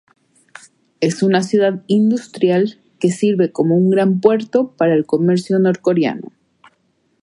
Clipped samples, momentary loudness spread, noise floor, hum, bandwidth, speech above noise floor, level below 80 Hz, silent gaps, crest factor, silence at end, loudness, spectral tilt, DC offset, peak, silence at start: under 0.1%; 6 LU; -63 dBFS; none; 11.5 kHz; 48 dB; -64 dBFS; none; 16 dB; 1 s; -16 LUFS; -7 dB/octave; under 0.1%; 0 dBFS; 1 s